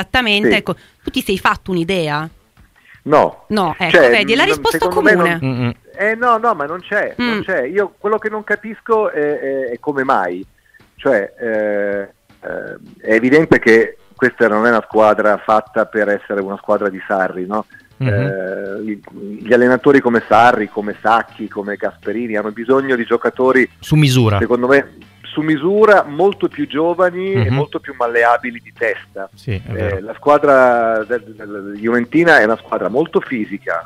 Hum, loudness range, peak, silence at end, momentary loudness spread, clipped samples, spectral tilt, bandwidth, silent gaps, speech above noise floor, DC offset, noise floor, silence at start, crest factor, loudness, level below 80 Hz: none; 5 LU; 0 dBFS; 0 s; 13 LU; under 0.1%; -6 dB/octave; 15.5 kHz; none; 35 dB; under 0.1%; -49 dBFS; 0 s; 16 dB; -15 LUFS; -48 dBFS